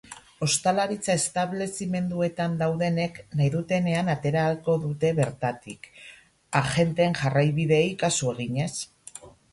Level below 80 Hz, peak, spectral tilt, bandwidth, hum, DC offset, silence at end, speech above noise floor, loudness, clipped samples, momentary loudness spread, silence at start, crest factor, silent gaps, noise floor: -58 dBFS; -6 dBFS; -5 dB/octave; 11.5 kHz; none; under 0.1%; 0.25 s; 22 dB; -25 LUFS; under 0.1%; 16 LU; 0.1 s; 20 dB; none; -47 dBFS